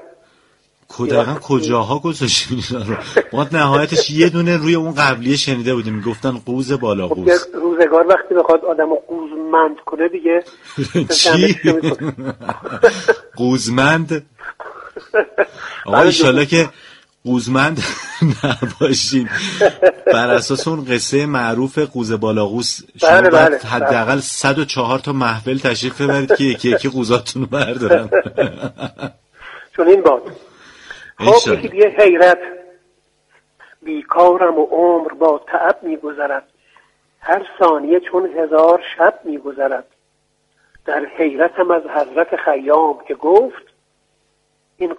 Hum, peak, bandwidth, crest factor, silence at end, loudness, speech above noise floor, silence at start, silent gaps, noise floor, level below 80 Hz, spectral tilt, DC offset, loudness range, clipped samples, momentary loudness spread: none; 0 dBFS; 11.5 kHz; 16 dB; 0 s; -15 LUFS; 49 dB; 0.9 s; none; -63 dBFS; -52 dBFS; -4.5 dB/octave; under 0.1%; 4 LU; under 0.1%; 13 LU